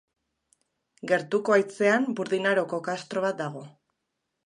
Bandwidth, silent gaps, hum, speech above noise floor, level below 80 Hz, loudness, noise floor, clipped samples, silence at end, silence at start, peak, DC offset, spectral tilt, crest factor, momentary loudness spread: 11 kHz; none; none; 55 dB; -80 dBFS; -26 LUFS; -81 dBFS; under 0.1%; 0.75 s; 1.05 s; -8 dBFS; under 0.1%; -5 dB/octave; 20 dB; 11 LU